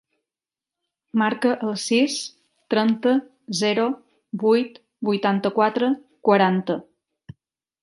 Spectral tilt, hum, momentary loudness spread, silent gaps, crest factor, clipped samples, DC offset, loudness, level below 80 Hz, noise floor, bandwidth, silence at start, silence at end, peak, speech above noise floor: -5 dB/octave; none; 10 LU; none; 20 dB; under 0.1%; under 0.1%; -22 LUFS; -70 dBFS; under -90 dBFS; 11.5 kHz; 1.15 s; 1 s; -2 dBFS; over 69 dB